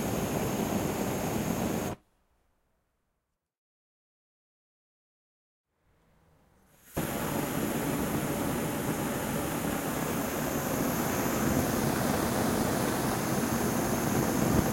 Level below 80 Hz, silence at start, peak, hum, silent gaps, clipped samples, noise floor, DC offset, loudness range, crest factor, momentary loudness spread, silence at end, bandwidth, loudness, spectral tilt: -50 dBFS; 0 s; -12 dBFS; none; 3.58-5.64 s; under 0.1%; -82 dBFS; under 0.1%; 10 LU; 20 dB; 4 LU; 0 s; 16.5 kHz; -30 LUFS; -5 dB/octave